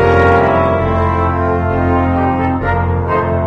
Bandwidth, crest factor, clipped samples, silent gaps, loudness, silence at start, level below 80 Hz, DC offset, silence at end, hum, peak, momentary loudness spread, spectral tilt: 6.2 kHz; 12 dB; under 0.1%; none; -13 LUFS; 0 s; -26 dBFS; under 0.1%; 0 s; none; 0 dBFS; 5 LU; -9 dB/octave